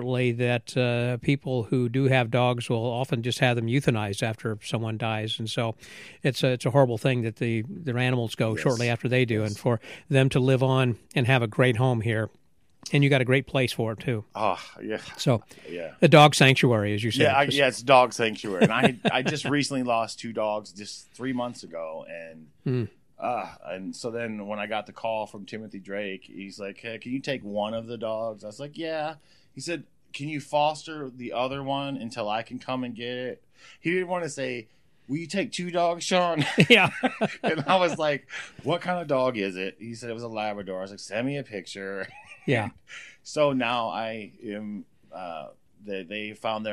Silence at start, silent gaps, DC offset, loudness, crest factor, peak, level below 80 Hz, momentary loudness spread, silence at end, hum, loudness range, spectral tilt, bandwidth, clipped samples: 0 s; none; under 0.1%; -26 LUFS; 24 dB; -2 dBFS; -64 dBFS; 16 LU; 0 s; none; 11 LU; -5.5 dB/octave; 15 kHz; under 0.1%